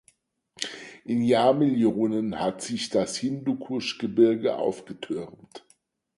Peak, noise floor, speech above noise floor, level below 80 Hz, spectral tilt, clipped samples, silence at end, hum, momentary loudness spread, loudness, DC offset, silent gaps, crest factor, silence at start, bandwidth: -8 dBFS; -65 dBFS; 41 dB; -66 dBFS; -5.5 dB/octave; under 0.1%; 0.6 s; none; 13 LU; -26 LUFS; under 0.1%; none; 18 dB; 0.6 s; 11.5 kHz